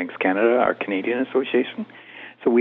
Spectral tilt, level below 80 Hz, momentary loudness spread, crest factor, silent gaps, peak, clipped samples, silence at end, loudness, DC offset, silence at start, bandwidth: -8.5 dB/octave; -70 dBFS; 17 LU; 16 dB; none; -4 dBFS; under 0.1%; 0 s; -22 LUFS; under 0.1%; 0 s; 4.1 kHz